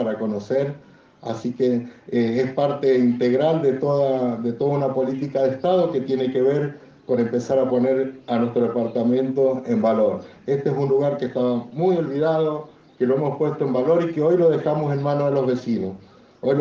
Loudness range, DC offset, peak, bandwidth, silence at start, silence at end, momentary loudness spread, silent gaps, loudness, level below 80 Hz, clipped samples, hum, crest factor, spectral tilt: 1 LU; under 0.1%; -8 dBFS; 7.2 kHz; 0 s; 0 s; 7 LU; none; -21 LUFS; -64 dBFS; under 0.1%; none; 14 dB; -8.5 dB/octave